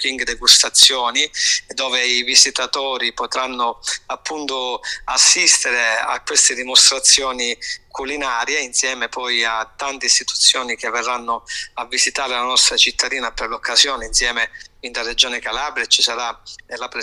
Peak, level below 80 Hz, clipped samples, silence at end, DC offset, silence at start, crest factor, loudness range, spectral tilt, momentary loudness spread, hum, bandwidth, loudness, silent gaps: 0 dBFS; -48 dBFS; under 0.1%; 0 s; under 0.1%; 0 s; 18 dB; 5 LU; 2 dB/octave; 14 LU; none; 16 kHz; -15 LUFS; none